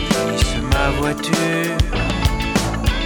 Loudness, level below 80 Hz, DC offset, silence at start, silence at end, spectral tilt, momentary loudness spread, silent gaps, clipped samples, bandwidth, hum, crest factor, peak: -19 LUFS; -24 dBFS; under 0.1%; 0 s; 0 s; -4.5 dB/octave; 2 LU; none; under 0.1%; over 20 kHz; none; 14 dB; -4 dBFS